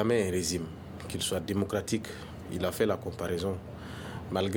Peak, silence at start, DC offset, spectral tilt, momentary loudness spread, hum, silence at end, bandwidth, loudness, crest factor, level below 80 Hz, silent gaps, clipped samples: -12 dBFS; 0 s; under 0.1%; -4.5 dB/octave; 12 LU; none; 0 s; over 20 kHz; -33 LUFS; 18 dB; -54 dBFS; none; under 0.1%